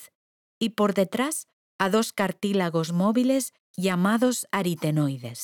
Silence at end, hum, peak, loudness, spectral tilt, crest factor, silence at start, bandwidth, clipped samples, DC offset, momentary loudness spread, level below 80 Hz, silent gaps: 0 s; none; -8 dBFS; -25 LUFS; -5 dB/octave; 18 dB; 0 s; 19.5 kHz; under 0.1%; under 0.1%; 7 LU; -72 dBFS; 0.15-0.61 s, 1.53-1.79 s, 3.60-3.74 s